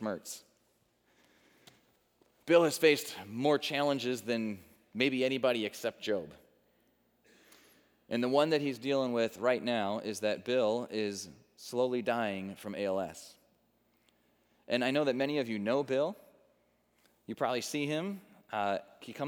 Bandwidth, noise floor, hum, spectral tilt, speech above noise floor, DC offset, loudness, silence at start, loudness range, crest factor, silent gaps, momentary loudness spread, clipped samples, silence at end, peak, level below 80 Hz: over 20 kHz; -73 dBFS; none; -4.5 dB/octave; 41 dB; under 0.1%; -32 LUFS; 0 s; 5 LU; 22 dB; none; 14 LU; under 0.1%; 0 s; -12 dBFS; -82 dBFS